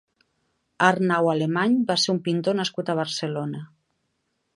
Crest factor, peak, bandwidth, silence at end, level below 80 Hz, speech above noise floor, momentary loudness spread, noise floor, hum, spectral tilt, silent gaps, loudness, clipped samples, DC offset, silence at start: 22 dB; -2 dBFS; 11.5 kHz; 0.9 s; -72 dBFS; 52 dB; 8 LU; -75 dBFS; none; -5 dB/octave; none; -23 LUFS; under 0.1%; under 0.1%; 0.8 s